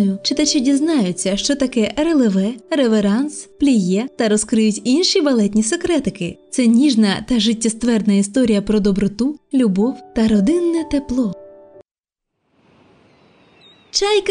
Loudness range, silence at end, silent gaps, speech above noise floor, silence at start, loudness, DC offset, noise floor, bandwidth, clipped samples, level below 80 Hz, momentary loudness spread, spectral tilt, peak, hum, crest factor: 5 LU; 0 s; 12.00-12.04 s; 68 dB; 0 s; -17 LUFS; under 0.1%; -84 dBFS; 10.5 kHz; under 0.1%; -44 dBFS; 6 LU; -4.5 dB/octave; -2 dBFS; none; 14 dB